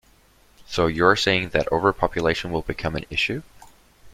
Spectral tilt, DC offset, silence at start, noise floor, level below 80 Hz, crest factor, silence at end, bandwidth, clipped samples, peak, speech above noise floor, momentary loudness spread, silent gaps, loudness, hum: -5 dB/octave; under 0.1%; 0.7 s; -56 dBFS; -44 dBFS; 22 dB; 0 s; 15.5 kHz; under 0.1%; -2 dBFS; 34 dB; 10 LU; none; -22 LUFS; none